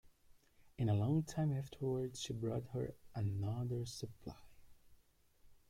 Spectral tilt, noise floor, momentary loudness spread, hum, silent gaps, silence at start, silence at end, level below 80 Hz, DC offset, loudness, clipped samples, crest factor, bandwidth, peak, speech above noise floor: -7 dB/octave; -70 dBFS; 12 LU; none; none; 0.05 s; 0.15 s; -66 dBFS; under 0.1%; -41 LUFS; under 0.1%; 16 dB; 15.5 kHz; -24 dBFS; 31 dB